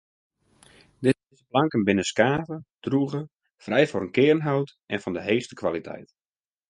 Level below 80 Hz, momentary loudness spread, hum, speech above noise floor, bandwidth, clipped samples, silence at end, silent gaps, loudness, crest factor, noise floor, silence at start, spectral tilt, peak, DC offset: -60 dBFS; 13 LU; none; over 66 dB; 11.5 kHz; under 0.1%; 0.65 s; 2.74-2.79 s; -25 LUFS; 22 dB; under -90 dBFS; 1 s; -6 dB/octave; -4 dBFS; under 0.1%